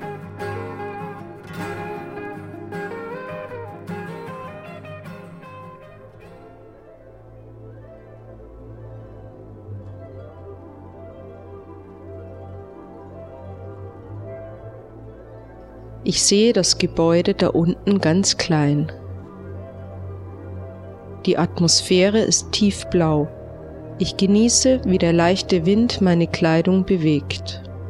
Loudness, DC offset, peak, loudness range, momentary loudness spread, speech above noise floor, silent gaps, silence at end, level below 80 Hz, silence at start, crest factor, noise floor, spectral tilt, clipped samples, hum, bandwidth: -19 LUFS; under 0.1%; -2 dBFS; 22 LU; 24 LU; 27 dB; none; 0 s; -46 dBFS; 0 s; 20 dB; -44 dBFS; -4.5 dB/octave; under 0.1%; none; 12.5 kHz